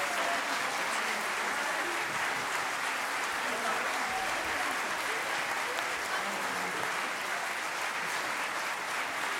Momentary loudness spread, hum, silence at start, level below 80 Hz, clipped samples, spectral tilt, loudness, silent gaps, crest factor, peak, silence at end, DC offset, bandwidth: 2 LU; none; 0 s; -70 dBFS; under 0.1%; -1 dB/octave; -31 LUFS; none; 18 dB; -16 dBFS; 0 s; under 0.1%; 16 kHz